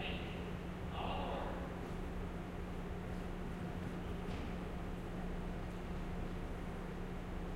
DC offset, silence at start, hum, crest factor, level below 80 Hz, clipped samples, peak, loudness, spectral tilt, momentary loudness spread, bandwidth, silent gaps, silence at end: under 0.1%; 0 s; none; 14 dB; -48 dBFS; under 0.1%; -28 dBFS; -45 LUFS; -7 dB/octave; 4 LU; 16 kHz; none; 0 s